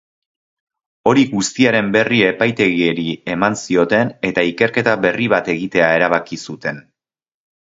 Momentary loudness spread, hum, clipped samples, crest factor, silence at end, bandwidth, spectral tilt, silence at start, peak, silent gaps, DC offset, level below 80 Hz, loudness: 8 LU; none; under 0.1%; 16 dB; 0.85 s; 8 kHz; -5 dB/octave; 1.05 s; 0 dBFS; none; under 0.1%; -54 dBFS; -16 LUFS